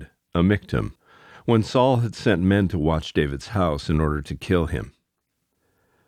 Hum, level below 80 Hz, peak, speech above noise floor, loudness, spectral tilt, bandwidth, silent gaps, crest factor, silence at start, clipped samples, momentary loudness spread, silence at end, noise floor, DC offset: none; -38 dBFS; -4 dBFS; 55 dB; -23 LUFS; -7 dB/octave; 13.5 kHz; none; 18 dB; 0 s; under 0.1%; 10 LU; 1.2 s; -76 dBFS; under 0.1%